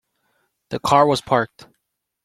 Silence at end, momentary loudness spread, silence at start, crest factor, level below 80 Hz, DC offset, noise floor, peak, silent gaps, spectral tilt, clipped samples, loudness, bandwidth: 0.8 s; 14 LU; 0.7 s; 20 dB; -56 dBFS; under 0.1%; -75 dBFS; -2 dBFS; none; -5 dB/octave; under 0.1%; -19 LUFS; 15 kHz